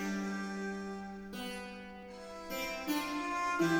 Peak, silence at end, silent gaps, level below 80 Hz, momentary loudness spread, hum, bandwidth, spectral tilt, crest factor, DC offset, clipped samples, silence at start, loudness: -20 dBFS; 0 s; none; -62 dBFS; 12 LU; none; 19.5 kHz; -4.5 dB/octave; 18 dB; under 0.1%; under 0.1%; 0 s; -39 LUFS